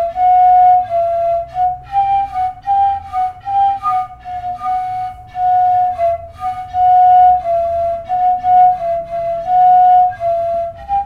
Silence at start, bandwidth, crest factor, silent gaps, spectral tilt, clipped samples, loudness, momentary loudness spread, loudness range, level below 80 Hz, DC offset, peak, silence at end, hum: 0 s; 4.7 kHz; 10 dB; none; -6 dB/octave; under 0.1%; -14 LUFS; 12 LU; 5 LU; -42 dBFS; under 0.1%; -2 dBFS; 0 s; none